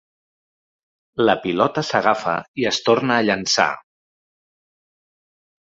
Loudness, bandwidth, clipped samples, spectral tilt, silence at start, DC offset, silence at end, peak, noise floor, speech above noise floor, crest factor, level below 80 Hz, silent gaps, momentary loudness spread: -19 LUFS; 7.8 kHz; under 0.1%; -3.5 dB/octave; 1.15 s; under 0.1%; 1.9 s; -2 dBFS; under -90 dBFS; over 71 dB; 20 dB; -60 dBFS; 2.48-2.54 s; 5 LU